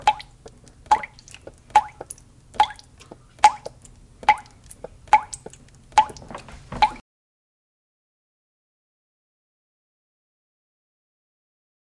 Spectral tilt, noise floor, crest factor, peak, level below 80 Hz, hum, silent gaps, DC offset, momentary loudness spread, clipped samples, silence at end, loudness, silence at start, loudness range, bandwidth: -2 dB/octave; -48 dBFS; 26 dB; 0 dBFS; -52 dBFS; none; none; under 0.1%; 23 LU; under 0.1%; 5 s; -22 LUFS; 0.05 s; 8 LU; 11.5 kHz